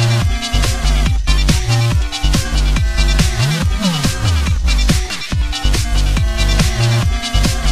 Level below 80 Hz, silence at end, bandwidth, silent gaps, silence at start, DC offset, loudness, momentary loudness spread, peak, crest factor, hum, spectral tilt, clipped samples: -16 dBFS; 0 s; 15 kHz; none; 0 s; 1%; -16 LUFS; 3 LU; 0 dBFS; 14 dB; none; -4.5 dB/octave; under 0.1%